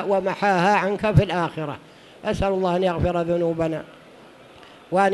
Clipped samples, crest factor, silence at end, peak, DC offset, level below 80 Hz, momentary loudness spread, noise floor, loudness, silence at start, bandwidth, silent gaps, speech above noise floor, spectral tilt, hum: under 0.1%; 20 dB; 0 s; -4 dBFS; under 0.1%; -42 dBFS; 12 LU; -47 dBFS; -22 LUFS; 0 s; 12 kHz; none; 25 dB; -7 dB/octave; none